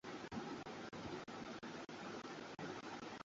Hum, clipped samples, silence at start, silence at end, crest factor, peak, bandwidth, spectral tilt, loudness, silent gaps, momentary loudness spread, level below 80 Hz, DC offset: none; under 0.1%; 0.05 s; 0 s; 16 dB; -34 dBFS; 7.6 kHz; -3.5 dB/octave; -50 LUFS; none; 2 LU; -76 dBFS; under 0.1%